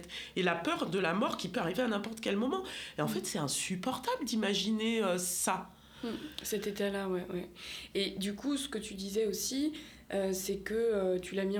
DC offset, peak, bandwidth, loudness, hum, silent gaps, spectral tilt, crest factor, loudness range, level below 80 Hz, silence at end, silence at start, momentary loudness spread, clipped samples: under 0.1%; -14 dBFS; over 20 kHz; -34 LUFS; none; none; -3.5 dB/octave; 20 dB; 3 LU; -62 dBFS; 0 s; 0 s; 8 LU; under 0.1%